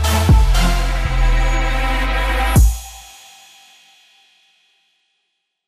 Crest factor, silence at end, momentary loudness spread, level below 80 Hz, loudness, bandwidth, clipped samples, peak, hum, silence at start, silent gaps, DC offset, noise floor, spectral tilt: 14 dB; 2.65 s; 20 LU; -18 dBFS; -17 LUFS; 15.5 kHz; under 0.1%; -2 dBFS; none; 0 s; none; under 0.1%; -72 dBFS; -5 dB/octave